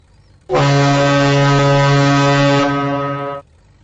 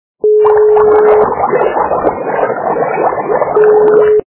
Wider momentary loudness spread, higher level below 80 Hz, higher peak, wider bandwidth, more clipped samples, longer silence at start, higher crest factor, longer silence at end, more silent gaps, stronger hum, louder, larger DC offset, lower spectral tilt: about the same, 9 LU vs 7 LU; about the same, -44 dBFS vs -44 dBFS; second, -6 dBFS vs 0 dBFS; first, 8 kHz vs 3.1 kHz; second, under 0.1% vs 0.2%; first, 0.5 s vs 0.25 s; about the same, 8 dB vs 10 dB; first, 0.4 s vs 0.1 s; neither; neither; second, -13 LUFS vs -10 LUFS; neither; second, -6 dB/octave vs -10.5 dB/octave